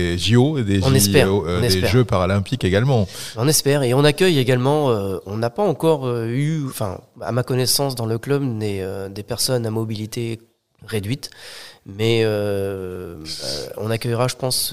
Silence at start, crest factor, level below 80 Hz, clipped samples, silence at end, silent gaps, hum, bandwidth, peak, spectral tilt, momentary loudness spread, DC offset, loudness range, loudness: 0 s; 20 dB; -50 dBFS; under 0.1%; 0 s; none; none; 16 kHz; 0 dBFS; -5 dB/octave; 12 LU; 0.5%; 7 LU; -20 LUFS